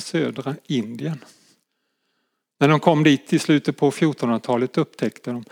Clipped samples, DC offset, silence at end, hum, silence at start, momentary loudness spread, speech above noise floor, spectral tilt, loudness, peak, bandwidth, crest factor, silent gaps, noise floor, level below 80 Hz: under 0.1%; under 0.1%; 0.05 s; none; 0 s; 14 LU; 53 dB; -6 dB/octave; -21 LUFS; -2 dBFS; 15 kHz; 20 dB; none; -74 dBFS; -76 dBFS